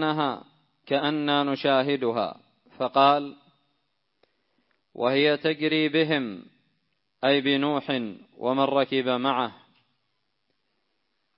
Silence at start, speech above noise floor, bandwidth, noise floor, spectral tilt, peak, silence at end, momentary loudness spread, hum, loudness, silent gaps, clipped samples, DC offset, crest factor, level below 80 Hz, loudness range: 0 s; 53 dB; 5.8 kHz; -77 dBFS; -9.5 dB/octave; -6 dBFS; 1.85 s; 11 LU; none; -25 LUFS; none; under 0.1%; under 0.1%; 20 dB; -76 dBFS; 3 LU